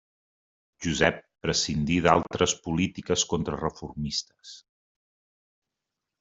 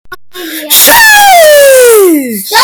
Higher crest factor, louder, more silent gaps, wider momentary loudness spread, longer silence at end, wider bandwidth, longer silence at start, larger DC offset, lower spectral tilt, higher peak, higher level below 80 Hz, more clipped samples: first, 26 dB vs 4 dB; second, -26 LUFS vs -2 LUFS; neither; second, 12 LU vs 17 LU; first, 1.6 s vs 0 s; second, 8 kHz vs over 20 kHz; first, 0.8 s vs 0.05 s; neither; first, -4 dB/octave vs -0.5 dB/octave; second, -4 dBFS vs 0 dBFS; second, -50 dBFS vs -42 dBFS; second, under 0.1% vs 7%